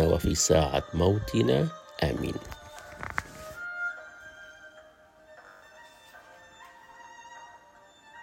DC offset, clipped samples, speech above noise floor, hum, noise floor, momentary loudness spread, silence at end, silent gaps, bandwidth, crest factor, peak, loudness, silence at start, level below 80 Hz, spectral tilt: under 0.1%; under 0.1%; 30 dB; none; -56 dBFS; 26 LU; 0 s; none; 16 kHz; 22 dB; -8 dBFS; -28 LUFS; 0 s; -44 dBFS; -4.5 dB/octave